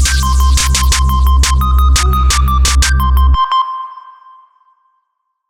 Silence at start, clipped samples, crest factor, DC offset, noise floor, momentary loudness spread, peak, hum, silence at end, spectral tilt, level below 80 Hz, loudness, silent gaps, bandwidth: 0 s; under 0.1%; 10 dB; under 0.1%; -68 dBFS; 3 LU; -2 dBFS; none; 1.4 s; -3 dB/octave; -12 dBFS; -11 LUFS; none; 16.5 kHz